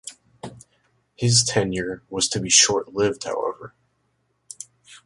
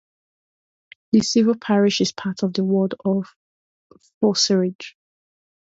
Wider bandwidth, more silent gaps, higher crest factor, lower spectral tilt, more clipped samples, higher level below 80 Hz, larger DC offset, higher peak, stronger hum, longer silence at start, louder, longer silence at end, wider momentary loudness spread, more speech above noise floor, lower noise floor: first, 11.5 kHz vs 8 kHz; second, none vs 3.36-3.90 s, 4.14-4.21 s, 4.75-4.79 s; about the same, 22 dB vs 18 dB; second, -2.5 dB/octave vs -5 dB/octave; neither; first, -54 dBFS vs -64 dBFS; neither; about the same, -2 dBFS vs -4 dBFS; neither; second, 0.05 s vs 1.15 s; about the same, -20 LUFS vs -20 LUFS; second, 0.1 s vs 0.85 s; first, 25 LU vs 9 LU; second, 48 dB vs over 71 dB; second, -70 dBFS vs under -90 dBFS